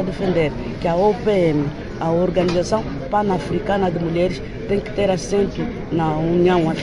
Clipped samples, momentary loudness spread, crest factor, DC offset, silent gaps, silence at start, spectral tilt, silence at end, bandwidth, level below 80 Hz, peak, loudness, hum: under 0.1%; 6 LU; 14 dB; under 0.1%; none; 0 s; -7 dB/octave; 0 s; 11 kHz; -36 dBFS; -4 dBFS; -20 LUFS; none